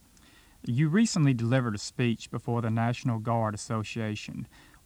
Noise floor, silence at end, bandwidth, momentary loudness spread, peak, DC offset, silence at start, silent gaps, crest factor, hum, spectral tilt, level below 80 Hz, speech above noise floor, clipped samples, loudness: -57 dBFS; 0.4 s; 12 kHz; 12 LU; -12 dBFS; under 0.1%; 0.65 s; none; 18 dB; none; -6 dB/octave; -62 dBFS; 29 dB; under 0.1%; -29 LUFS